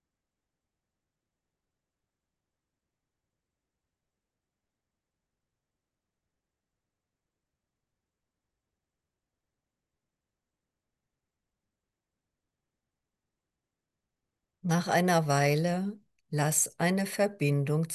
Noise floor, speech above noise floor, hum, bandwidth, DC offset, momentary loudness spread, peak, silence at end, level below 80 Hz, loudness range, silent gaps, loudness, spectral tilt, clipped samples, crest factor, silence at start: -88 dBFS; 61 dB; none; 12.5 kHz; under 0.1%; 8 LU; -12 dBFS; 0 s; -80 dBFS; 8 LU; none; -28 LUFS; -5 dB/octave; under 0.1%; 22 dB; 14.65 s